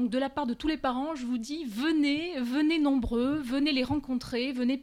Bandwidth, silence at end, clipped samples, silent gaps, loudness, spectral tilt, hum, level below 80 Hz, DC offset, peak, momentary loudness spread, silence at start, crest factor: 15 kHz; 0 s; under 0.1%; none; -29 LUFS; -5 dB/octave; none; -50 dBFS; under 0.1%; -16 dBFS; 6 LU; 0 s; 12 dB